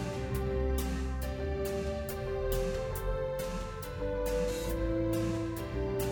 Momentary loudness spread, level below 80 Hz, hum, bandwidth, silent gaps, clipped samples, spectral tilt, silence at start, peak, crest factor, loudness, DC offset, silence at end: 4 LU; -38 dBFS; none; over 20 kHz; none; under 0.1%; -6 dB/octave; 0 s; -20 dBFS; 12 dB; -34 LUFS; under 0.1%; 0 s